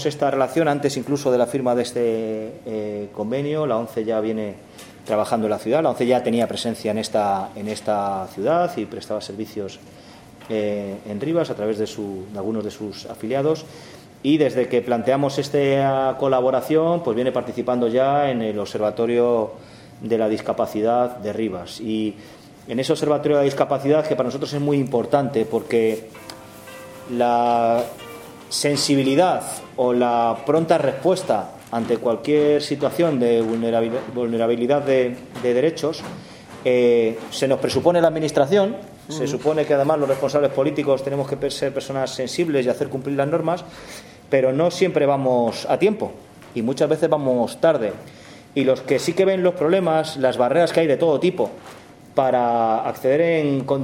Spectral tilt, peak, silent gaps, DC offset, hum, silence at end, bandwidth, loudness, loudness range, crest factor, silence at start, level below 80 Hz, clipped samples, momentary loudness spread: -5.5 dB/octave; -2 dBFS; none; under 0.1%; none; 0 s; 16.5 kHz; -21 LUFS; 5 LU; 18 dB; 0 s; -60 dBFS; under 0.1%; 12 LU